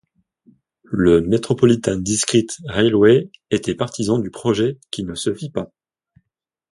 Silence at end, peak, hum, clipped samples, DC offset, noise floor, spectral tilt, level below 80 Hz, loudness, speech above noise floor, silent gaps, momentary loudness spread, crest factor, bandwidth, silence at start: 1.05 s; 0 dBFS; none; under 0.1%; under 0.1%; -80 dBFS; -5 dB/octave; -46 dBFS; -18 LUFS; 62 dB; none; 13 LU; 18 dB; 11.5 kHz; 0.9 s